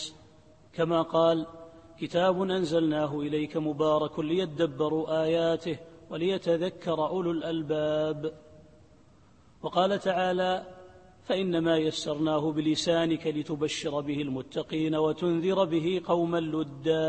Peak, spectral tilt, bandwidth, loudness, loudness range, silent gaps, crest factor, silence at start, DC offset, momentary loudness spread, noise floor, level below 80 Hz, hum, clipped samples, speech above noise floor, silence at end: -10 dBFS; -6 dB/octave; 8.8 kHz; -28 LUFS; 3 LU; none; 18 dB; 0 s; under 0.1%; 7 LU; -59 dBFS; -64 dBFS; none; under 0.1%; 31 dB; 0 s